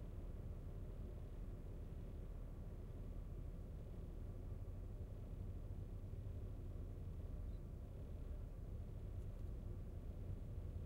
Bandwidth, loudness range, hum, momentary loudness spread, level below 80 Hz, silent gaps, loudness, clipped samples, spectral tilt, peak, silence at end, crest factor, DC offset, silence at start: 15.5 kHz; 1 LU; none; 2 LU; -52 dBFS; none; -53 LUFS; under 0.1%; -9 dB/octave; -38 dBFS; 0 s; 12 dB; under 0.1%; 0 s